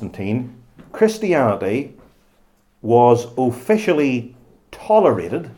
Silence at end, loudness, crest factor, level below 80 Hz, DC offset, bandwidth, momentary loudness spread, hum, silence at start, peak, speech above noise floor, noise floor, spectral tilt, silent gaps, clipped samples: 0.05 s; -18 LUFS; 18 dB; -56 dBFS; under 0.1%; 18 kHz; 19 LU; none; 0 s; 0 dBFS; 40 dB; -57 dBFS; -7 dB/octave; none; under 0.1%